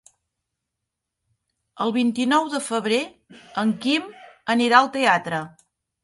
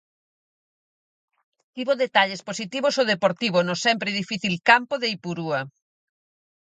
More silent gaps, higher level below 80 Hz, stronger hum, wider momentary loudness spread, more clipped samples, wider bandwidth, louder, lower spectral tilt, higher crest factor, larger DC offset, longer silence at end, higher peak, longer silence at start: neither; about the same, -70 dBFS vs -72 dBFS; neither; first, 16 LU vs 12 LU; neither; first, 11.5 kHz vs 9.4 kHz; about the same, -21 LUFS vs -22 LUFS; about the same, -4 dB/octave vs -4 dB/octave; about the same, 22 dB vs 24 dB; neither; second, 0.55 s vs 0.95 s; about the same, -2 dBFS vs -2 dBFS; about the same, 1.75 s vs 1.75 s